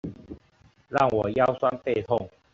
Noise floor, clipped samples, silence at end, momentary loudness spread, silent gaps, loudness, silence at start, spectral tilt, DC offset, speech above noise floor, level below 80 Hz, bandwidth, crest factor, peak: -60 dBFS; under 0.1%; 0.25 s; 22 LU; none; -25 LUFS; 0.05 s; -5.5 dB/octave; under 0.1%; 36 dB; -56 dBFS; 7.6 kHz; 20 dB; -8 dBFS